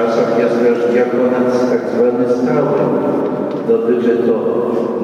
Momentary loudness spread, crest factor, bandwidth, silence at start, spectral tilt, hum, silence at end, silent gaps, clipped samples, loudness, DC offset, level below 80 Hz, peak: 3 LU; 12 dB; 7.8 kHz; 0 s; -7.5 dB/octave; none; 0 s; none; under 0.1%; -14 LUFS; under 0.1%; -60 dBFS; -2 dBFS